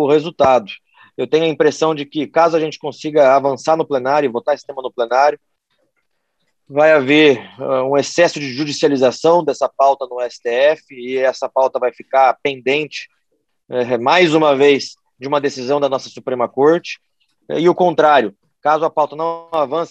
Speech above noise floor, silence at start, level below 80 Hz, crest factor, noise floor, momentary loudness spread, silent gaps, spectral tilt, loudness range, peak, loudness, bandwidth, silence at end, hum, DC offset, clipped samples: 55 dB; 0 s; -64 dBFS; 14 dB; -70 dBFS; 12 LU; none; -5 dB/octave; 3 LU; 0 dBFS; -16 LUFS; 8.6 kHz; 0.05 s; none; under 0.1%; under 0.1%